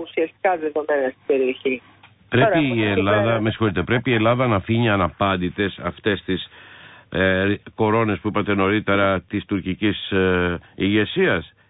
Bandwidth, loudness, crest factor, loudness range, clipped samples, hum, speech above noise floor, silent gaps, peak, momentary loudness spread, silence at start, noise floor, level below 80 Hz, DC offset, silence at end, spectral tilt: 4 kHz; -21 LUFS; 16 dB; 3 LU; under 0.1%; none; 24 dB; none; -6 dBFS; 7 LU; 0 s; -45 dBFS; -44 dBFS; under 0.1%; 0.2 s; -11.5 dB/octave